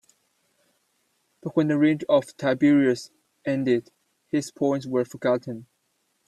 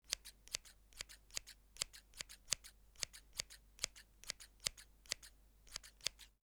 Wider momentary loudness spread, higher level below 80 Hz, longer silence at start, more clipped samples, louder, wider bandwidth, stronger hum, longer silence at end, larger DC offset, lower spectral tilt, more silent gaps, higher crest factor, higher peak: about the same, 14 LU vs 13 LU; about the same, -70 dBFS vs -66 dBFS; first, 1.45 s vs 0.05 s; neither; first, -24 LUFS vs -47 LUFS; second, 12 kHz vs over 20 kHz; neither; first, 0.65 s vs 0.15 s; neither; first, -6.5 dB/octave vs 1 dB/octave; neither; second, 18 dB vs 38 dB; first, -8 dBFS vs -12 dBFS